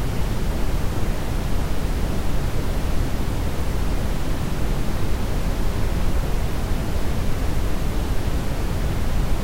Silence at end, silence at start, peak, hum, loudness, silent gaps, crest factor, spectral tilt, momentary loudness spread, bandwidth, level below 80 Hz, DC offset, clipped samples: 0 s; 0 s; -10 dBFS; none; -26 LUFS; none; 10 dB; -6 dB/octave; 1 LU; 16 kHz; -24 dBFS; under 0.1%; under 0.1%